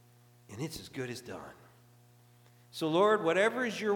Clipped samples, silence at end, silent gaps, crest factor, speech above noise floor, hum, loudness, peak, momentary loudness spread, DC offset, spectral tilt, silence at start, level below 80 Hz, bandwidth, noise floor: under 0.1%; 0 s; none; 18 dB; 30 dB; 60 Hz at -65 dBFS; -31 LUFS; -14 dBFS; 20 LU; under 0.1%; -5 dB/octave; 0.5 s; -72 dBFS; 19 kHz; -61 dBFS